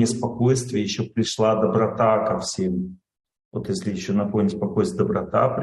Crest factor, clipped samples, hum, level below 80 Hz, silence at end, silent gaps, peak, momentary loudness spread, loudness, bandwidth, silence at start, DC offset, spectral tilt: 16 dB; under 0.1%; none; -56 dBFS; 0 s; 3.45-3.51 s; -6 dBFS; 8 LU; -23 LUFS; 12 kHz; 0 s; under 0.1%; -6 dB/octave